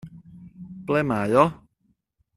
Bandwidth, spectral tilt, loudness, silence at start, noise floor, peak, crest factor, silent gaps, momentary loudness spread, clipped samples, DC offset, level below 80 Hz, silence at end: 13.5 kHz; -7.5 dB/octave; -22 LUFS; 0.05 s; -69 dBFS; -2 dBFS; 24 dB; none; 24 LU; under 0.1%; under 0.1%; -58 dBFS; 0.85 s